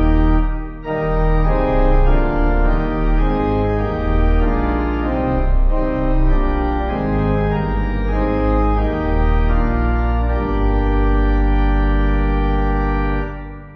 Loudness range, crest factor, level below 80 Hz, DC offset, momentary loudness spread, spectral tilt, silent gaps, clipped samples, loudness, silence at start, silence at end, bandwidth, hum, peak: 1 LU; 12 dB; -18 dBFS; under 0.1%; 3 LU; -10 dB/octave; none; under 0.1%; -19 LUFS; 0 s; 0 s; 5 kHz; none; -2 dBFS